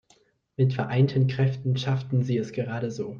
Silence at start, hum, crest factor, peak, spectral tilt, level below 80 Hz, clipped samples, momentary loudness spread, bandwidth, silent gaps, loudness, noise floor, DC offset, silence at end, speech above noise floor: 0.6 s; none; 16 dB; -10 dBFS; -8 dB/octave; -62 dBFS; under 0.1%; 8 LU; 7 kHz; none; -26 LUFS; -63 dBFS; under 0.1%; 0 s; 39 dB